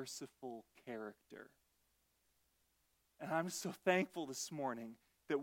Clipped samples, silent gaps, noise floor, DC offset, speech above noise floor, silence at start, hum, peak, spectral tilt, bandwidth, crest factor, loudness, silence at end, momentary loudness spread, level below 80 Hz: under 0.1%; none; -80 dBFS; under 0.1%; 37 dB; 0 s; none; -20 dBFS; -4 dB/octave; 16.5 kHz; 26 dB; -43 LUFS; 0 s; 18 LU; -86 dBFS